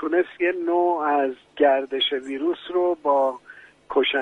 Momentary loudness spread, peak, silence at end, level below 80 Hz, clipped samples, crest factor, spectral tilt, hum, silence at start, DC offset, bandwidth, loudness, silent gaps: 6 LU; -6 dBFS; 0 s; -68 dBFS; under 0.1%; 16 dB; -4.5 dB/octave; none; 0 s; under 0.1%; 8 kHz; -23 LUFS; none